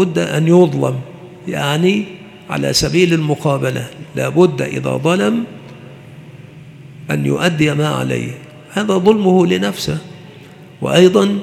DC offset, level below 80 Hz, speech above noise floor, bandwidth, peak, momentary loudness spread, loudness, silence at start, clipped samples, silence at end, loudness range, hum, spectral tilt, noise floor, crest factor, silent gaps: under 0.1%; -48 dBFS; 24 dB; 15.5 kHz; 0 dBFS; 18 LU; -15 LUFS; 0 s; under 0.1%; 0 s; 4 LU; none; -5.5 dB/octave; -38 dBFS; 16 dB; none